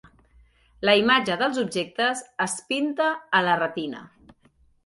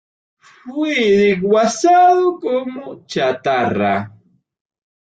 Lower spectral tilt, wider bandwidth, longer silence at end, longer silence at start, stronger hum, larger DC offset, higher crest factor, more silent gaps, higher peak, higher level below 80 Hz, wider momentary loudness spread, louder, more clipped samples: second, -3.5 dB/octave vs -5 dB/octave; first, 11.5 kHz vs 9.2 kHz; second, 0.8 s vs 0.95 s; first, 0.8 s vs 0.65 s; neither; neither; first, 22 dB vs 14 dB; neither; about the same, -4 dBFS vs -4 dBFS; about the same, -62 dBFS vs -58 dBFS; second, 9 LU vs 15 LU; second, -23 LUFS vs -15 LUFS; neither